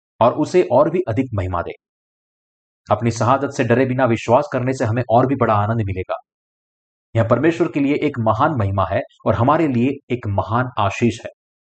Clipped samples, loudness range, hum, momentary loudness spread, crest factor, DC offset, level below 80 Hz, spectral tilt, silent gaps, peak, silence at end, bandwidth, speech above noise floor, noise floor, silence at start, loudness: under 0.1%; 3 LU; none; 8 LU; 16 dB; under 0.1%; -50 dBFS; -7.5 dB/octave; 1.89-2.84 s, 6.34-7.13 s, 10.03-10.08 s; -4 dBFS; 0.45 s; 8.8 kHz; over 72 dB; under -90 dBFS; 0.2 s; -18 LUFS